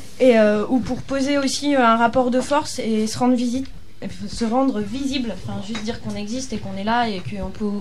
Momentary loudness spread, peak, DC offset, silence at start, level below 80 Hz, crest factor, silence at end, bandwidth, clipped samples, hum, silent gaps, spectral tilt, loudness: 13 LU; -4 dBFS; 3%; 0 s; -44 dBFS; 18 dB; 0 s; 13.5 kHz; under 0.1%; none; none; -5 dB/octave; -21 LUFS